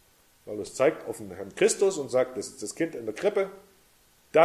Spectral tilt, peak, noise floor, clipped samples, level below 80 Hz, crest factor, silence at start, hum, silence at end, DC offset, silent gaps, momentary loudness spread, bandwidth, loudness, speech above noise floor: -4 dB/octave; -6 dBFS; -61 dBFS; under 0.1%; -66 dBFS; 22 dB; 0.45 s; none; 0 s; under 0.1%; none; 13 LU; 15 kHz; -28 LUFS; 34 dB